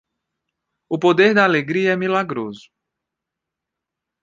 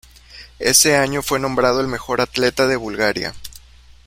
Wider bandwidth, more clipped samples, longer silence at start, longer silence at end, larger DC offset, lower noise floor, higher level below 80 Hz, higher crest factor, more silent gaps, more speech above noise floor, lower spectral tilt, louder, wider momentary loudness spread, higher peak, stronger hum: second, 7.6 kHz vs 16.5 kHz; neither; first, 0.9 s vs 0.3 s; first, 1.65 s vs 0.5 s; neither; first, -83 dBFS vs -45 dBFS; second, -66 dBFS vs -44 dBFS; about the same, 18 dB vs 20 dB; neither; first, 66 dB vs 27 dB; first, -6 dB/octave vs -2.5 dB/octave; about the same, -17 LUFS vs -17 LUFS; about the same, 14 LU vs 13 LU; about the same, -2 dBFS vs 0 dBFS; neither